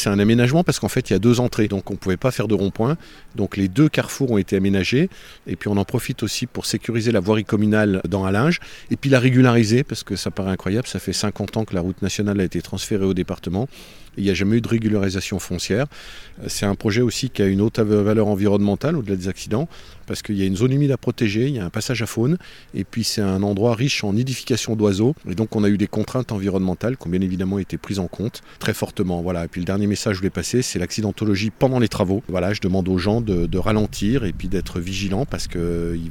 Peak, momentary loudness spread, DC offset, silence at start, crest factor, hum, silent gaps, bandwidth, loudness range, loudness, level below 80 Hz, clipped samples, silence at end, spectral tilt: -2 dBFS; 8 LU; under 0.1%; 0 s; 18 dB; none; none; 17 kHz; 4 LU; -21 LUFS; -40 dBFS; under 0.1%; 0 s; -6 dB/octave